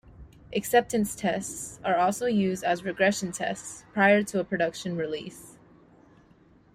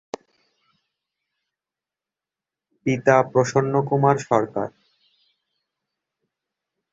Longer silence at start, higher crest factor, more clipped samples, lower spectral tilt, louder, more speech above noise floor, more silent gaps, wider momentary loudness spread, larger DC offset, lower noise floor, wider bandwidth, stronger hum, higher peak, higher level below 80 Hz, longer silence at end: second, 0.2 s vs 2.85 s; about the same, 20 dB vs 24 dB; neither; second, -4.5 dB/octave vs -6.5 dB/octave; second, -27 LUFS vs -20 LUFS; second, 31 dB vs 70 dB; neither; about the same, 12 LU vs 14 LU; neither; second, -58 dBFS vs -89 dBFS; first, 15.5 kHz vs 8 kHz; neither; second, -8 dBFS vs -2 dBFS; about the same, -60 dBFS vs -62 dBFS; second, 1.25 s vs 2.25 s